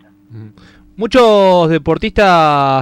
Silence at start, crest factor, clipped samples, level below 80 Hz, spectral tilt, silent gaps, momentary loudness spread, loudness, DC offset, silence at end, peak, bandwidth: 0.3 s; 10 dB; under 0.1%; -36 dBFS; -6 dB/octave; none; 7 LU; -10 LUFS; under 0.1%; 0 s; -2 dBFS; 14 kHz